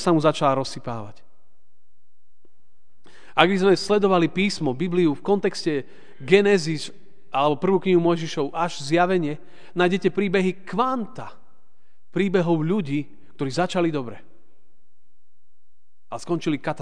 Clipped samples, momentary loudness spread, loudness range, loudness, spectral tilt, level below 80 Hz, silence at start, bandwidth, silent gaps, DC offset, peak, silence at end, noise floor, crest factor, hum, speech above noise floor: under 0.1%; 15 LU; 7 LU; -22 LUFS; -6 dB/octave; -62 dBFS; 0 s; 10 kHz; none; 2%; 0 dBFS; 0 s; -76 dBFS; 24 dB; none; 54 dB